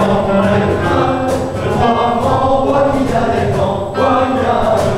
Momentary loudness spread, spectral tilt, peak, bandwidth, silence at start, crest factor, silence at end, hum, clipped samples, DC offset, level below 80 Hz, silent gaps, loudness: 3 LU; -7 dB/octave; -2 dBFS; 15 kHz; 0 s; 12 dB; 0 s; none; under 0.1%; under 0.1%; -34 dBFS; none; -14 LUFS